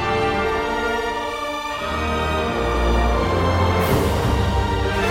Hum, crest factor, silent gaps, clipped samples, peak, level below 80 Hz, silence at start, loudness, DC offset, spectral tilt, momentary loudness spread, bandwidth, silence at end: none; 14 dB; none; under 0.1%; -6 dBFS; -26 dBFS; 0 s; -21 LUFS; under 0.1%; -5.5 dB/octave; 6 LU; 16.5 kHz; 0 s